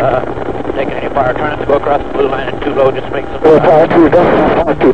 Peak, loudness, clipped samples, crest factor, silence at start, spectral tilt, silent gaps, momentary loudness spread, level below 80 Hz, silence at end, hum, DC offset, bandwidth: 0 dBFS; -11 LUFS; 1%; 12 dB; 0 s; -8 dB/octave; none; 11 LU; -32 dBFS; 0 s; none; 6%; 8.6 kHz